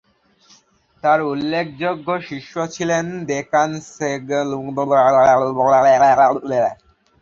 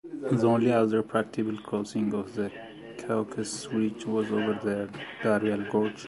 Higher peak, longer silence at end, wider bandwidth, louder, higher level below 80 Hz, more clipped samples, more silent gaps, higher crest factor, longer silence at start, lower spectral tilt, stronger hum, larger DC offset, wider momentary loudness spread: first, -2 dBFS vs -10 dBFS; first, 0.45 s vs 0 s; second, 7.6 kHz vs 11.5 kHz; first, -17 LUFS vs -28 LUFS; first, -58 dBFS vs -66 dBFS; neither; neither; about the same, 16 dB vs 18 dB; first, 1.05 s vs 0.05 s; about the same, -5.5 dB/octave vs -6 dB/octave; neither; neither; about the same, 12 LU vs 11 LU